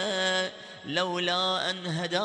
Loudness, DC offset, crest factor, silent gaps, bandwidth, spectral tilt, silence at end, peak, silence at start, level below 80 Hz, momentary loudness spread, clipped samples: -28 LUFS; under 0.1%; 16 dB; none; 10.5 kHz; -3.5 dB/octave; 0 s; -12 dBFS; 0 s; -74 dBFS; 7 LU; under 0.1%